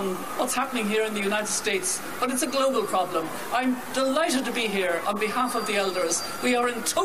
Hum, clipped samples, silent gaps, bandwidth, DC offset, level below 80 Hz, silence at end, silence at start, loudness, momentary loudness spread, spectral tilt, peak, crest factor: none; under 0.1%; none; 15.5 kHz; 0.6%; -64 dBFS; 0 s; 0 s; -25 LUFS; 4 LU; -2.5 dB/octave; -10 dBFS; 16 dB